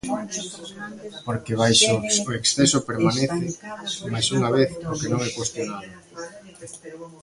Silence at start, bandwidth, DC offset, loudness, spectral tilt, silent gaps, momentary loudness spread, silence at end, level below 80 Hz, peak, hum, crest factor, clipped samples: 0.05 s; 11.5 kHz; under 0.1%; -22 LUFS; -3.5 dB/octave; none; 21 LU; 0.05 s; -54 dBFS; -4 dBFS; none; 20 dB; under 0.1%